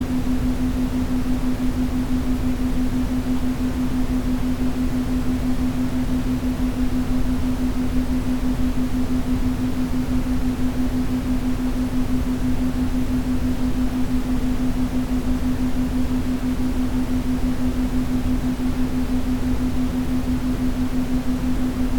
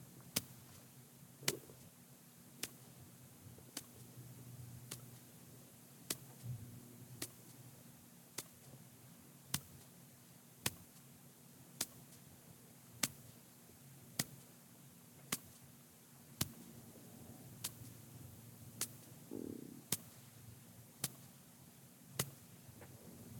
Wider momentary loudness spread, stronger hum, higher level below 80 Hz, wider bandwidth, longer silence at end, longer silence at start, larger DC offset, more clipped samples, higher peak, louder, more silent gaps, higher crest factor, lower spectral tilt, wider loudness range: second, 1 LU vs 17 LU; neither; first, -26 dBFS vs -78 dBFS; about the same, 19 kHz vs 17.5 kHz; about the same, 0 s vs 0 s; about the same, 0 s vs 0 s; neither; neither; first, -8 dBFS vs -14 dBFS; first, -23 LUFS vs -48 LUFS; neither; second, 14 dB vs 38 dB; first, -7 dB/octave vs -2.5 dB/octave; second, 0 LU vs 6 LU